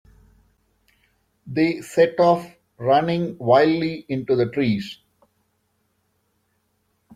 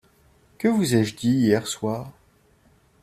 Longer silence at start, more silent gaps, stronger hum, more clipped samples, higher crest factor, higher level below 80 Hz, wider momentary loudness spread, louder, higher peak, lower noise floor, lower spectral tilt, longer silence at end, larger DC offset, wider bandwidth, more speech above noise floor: first, 1.45 s vs 0.6 s; neither; neither; neither; about the same, 20 dB vs 20 dB; about the same, -60 dBFS vs -58 dBFS; about the same, 12 LU vs 10 LU; first, -20 LUFS vs -23 LUFS; about the same, -4 dBFS vs -6 dBFS; first, -70 dBFS vs -59 dBFS; first, -7 dB/octave vs -5.5 dB/octave; first, 2.25 s vs 0.9 s; neither; about the same, 15 kHz vs 15 kHz; first, 50 dB vs 37 dB